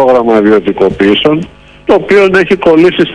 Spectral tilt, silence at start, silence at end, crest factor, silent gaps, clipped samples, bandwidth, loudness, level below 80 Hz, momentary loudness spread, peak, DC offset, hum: -6.5 dB/octave; 0 s; 0 s; 8 dB; none; 6%; 11 kHz; -8 LUFS; -38 dBFS; 6 LU; 0 dBFS; under 0.1%; none